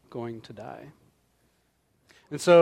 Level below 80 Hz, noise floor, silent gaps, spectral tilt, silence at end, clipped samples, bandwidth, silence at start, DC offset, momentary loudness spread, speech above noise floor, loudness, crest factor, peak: -72 dBFS; -70 dBFS; none; -5.5 dB/octave; 0 s; under 0.1%; 13.5 kHz; 0.15 s; under 0.1%; 20 LU; 46 dB; -29 LUFS; 20 dB; -6 dBFS